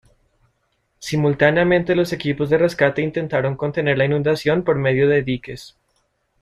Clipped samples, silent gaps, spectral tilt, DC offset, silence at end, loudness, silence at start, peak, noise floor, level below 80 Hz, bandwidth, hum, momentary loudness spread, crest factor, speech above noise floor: under 0.1%; none; -6.5 dB/octave; under 0.1%; 0.75 s; -19 LUFS; 1 s; -2 dBFS; -68 dBFS; -50 dBFS; 13 kHz; none; 9 LU; 18 dB; 50 dB